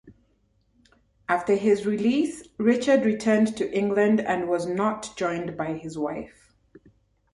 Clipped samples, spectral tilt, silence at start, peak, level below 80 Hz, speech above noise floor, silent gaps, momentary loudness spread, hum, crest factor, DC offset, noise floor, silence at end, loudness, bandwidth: under 0.1%; -6 dB/octave; 0.05 s; -8 dBFS; -62 dBFS; 43 dB; none; 10 LU; none; 18 dB; under 0.1%; -67 dBFS; 1.05 s; -24 LUFS; 11.5 kHz